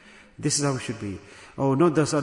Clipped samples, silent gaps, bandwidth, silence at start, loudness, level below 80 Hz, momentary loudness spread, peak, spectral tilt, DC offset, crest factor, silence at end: under 0.1%; none; 11 kHz; 0.4 s; -24 LUFS; -60 dBFS; 17 LU; -8 dBFS; -5 dB/octave; under 0.1%; 16 dB; 0 s